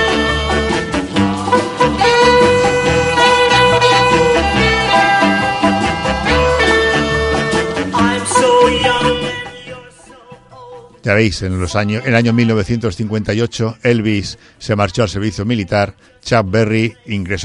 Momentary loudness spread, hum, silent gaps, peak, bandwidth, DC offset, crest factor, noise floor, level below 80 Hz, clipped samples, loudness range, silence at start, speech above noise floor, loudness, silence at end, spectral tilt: 9 LU; none; none; 0 dBFS; 11.5 kHz; under 0.1%; 14 dB; -40 dBFS; -30 dBFS; under 0.1%; 6 LU; 0 s; 24 dB; -13 LUFS; 0 s; -5 dB/octave